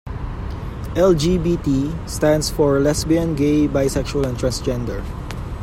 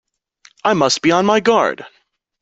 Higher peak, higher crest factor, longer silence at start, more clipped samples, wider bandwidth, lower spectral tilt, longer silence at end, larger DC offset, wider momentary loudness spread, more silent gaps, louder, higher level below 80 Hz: second, -4 dBFS vs 0 dBFS; about the same, 16 dB vs 16 dB; second, 0.05 s vs 0.65 s; neither; first, 16 kHz vs 8.4 kHz; first, -6 dB/octave vs -4 dB/octave; second, 0 s vs 0.55 s; neither; first, 13 LU vs 8 LU; neither; second, -19 LUFS vs -15 LUFS; first, -30 dBFS vs -58 dBFS